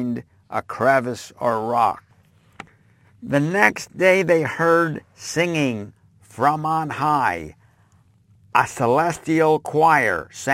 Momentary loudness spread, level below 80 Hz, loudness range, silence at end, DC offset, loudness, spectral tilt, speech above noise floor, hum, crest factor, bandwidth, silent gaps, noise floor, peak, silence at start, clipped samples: 13 LU; -58 dBFS; 4 LU; 0 s; under 0.1%; -20 LUFS; -5.5 dB/octave; 37 dB; none; 22 dB; 16.5 kHz; none; -56 dBFS; 0 dBFS; 0 s; under 0.1%